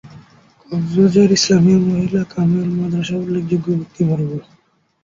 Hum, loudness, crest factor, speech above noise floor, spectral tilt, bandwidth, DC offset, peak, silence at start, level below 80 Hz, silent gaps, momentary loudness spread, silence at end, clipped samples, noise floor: none; -16 LUFS; 14 dB; 33 dB; -6 dB/octave; 7.6 kHz; under 0.1%; -2 dBFS; 0.05 s; -50 dBFS; none; 10 LU; 0.6 s; under 0.1%; -48 dBFS